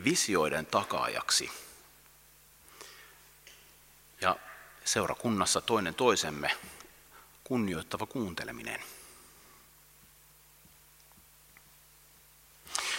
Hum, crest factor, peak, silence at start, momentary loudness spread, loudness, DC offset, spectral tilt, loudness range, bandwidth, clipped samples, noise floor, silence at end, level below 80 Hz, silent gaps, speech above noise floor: none; 26 dB; -10 dBFS; 0 s; 25 LU; -31 LUFS; under 0.1%; -2.5 dB/octave; 12 LU; 17 kHz; under 0.1%; -60 dBFS; 0 s; -64 dBFS; none; 28 dB